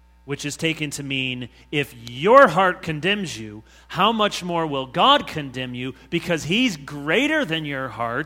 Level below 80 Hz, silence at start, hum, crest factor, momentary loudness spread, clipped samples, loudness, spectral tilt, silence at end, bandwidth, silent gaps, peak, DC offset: -52 dBFS; 0.25 s; none; 22 dB; 14 LU; under 0.1%; -21 LUFS; -4.5 dB/octave; 0 s; 16.5 kHz; none; 0 dBFS; under 0.1%